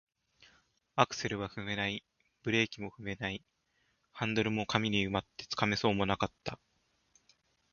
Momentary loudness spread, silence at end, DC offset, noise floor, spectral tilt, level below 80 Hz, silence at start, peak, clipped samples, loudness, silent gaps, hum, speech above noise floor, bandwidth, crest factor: 12 LU; 1.2 s; under 0.1%; -76 dBFS; -3.5 dB/octave; -60 dBFS; 0.95 s; -8 dBFS; under 0.1%; -34 LUFS; none; none; 43 dB; 7 kHz; 28 dB